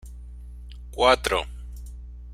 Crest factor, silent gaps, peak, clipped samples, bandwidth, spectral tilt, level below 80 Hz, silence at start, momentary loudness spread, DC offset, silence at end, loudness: 24 dB; none; -2 dBFS; under 0.1%; 15.5 kHz; -3.5 dB/octave; -38 dBFS; 0.05 s; 23 LU; under 0.1%; 0 s; -22 LUFS